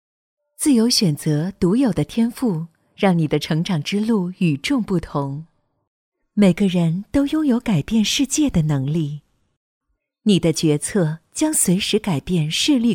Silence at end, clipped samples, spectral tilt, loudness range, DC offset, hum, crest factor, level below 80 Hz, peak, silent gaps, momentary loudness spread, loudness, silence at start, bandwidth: 0 s; under 0.1%; -5 dB/octave; 2 LU; under 0.1%; none; 18 dB; -46 dBFS; -2 dBFS; 5.87-6.12 s, 9.56-9.81 s; 7 LU; -19 LUFS; 0.6 s; 17 kHz